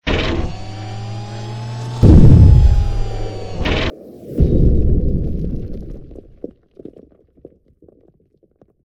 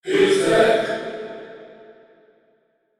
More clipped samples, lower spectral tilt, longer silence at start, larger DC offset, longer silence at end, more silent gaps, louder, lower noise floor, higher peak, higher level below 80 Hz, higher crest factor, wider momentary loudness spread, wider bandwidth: first, 0.2% vs under 0.1%; first, -8 dB/octave vs -4 dB/octave; about the same, 0.05 s vs 0.05 s; neither; first, 2.65 s vs 1.25 s; neither; first, -15 LUFS vs -18 LUFS; second, -57 dBFS vs -64 dBFS; first, 0 dBFS vs -4 dBFS; first, -18 dBFS vs -56 dBFS; about the same, 14 dB vs 18 dB; first, 26 LU vs 21 LU; second, 8.2 kHz vs 13.5 kHz